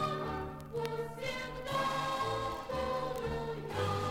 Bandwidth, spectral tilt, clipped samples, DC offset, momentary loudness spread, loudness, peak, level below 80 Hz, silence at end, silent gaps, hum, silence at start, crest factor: 16 kHz; -5 dB/octave; under 0.1%; under 0.1%; 5 LU; -37 LUFS; -18 dBFS; -54 dBFS; 0 s; none; none; 0 s; 18 dB